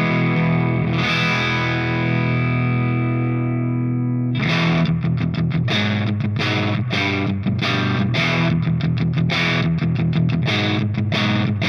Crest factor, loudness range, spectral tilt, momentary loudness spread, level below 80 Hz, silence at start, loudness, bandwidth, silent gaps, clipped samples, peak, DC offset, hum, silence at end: 12 dB; 1 LU; -7 dB/octave; 3 LU; -48 dBFS; 0 s; -19 LUFS; 6.8 kHz; none; under 0.1%; -6 dBFS; under 0.1%; none; 0 s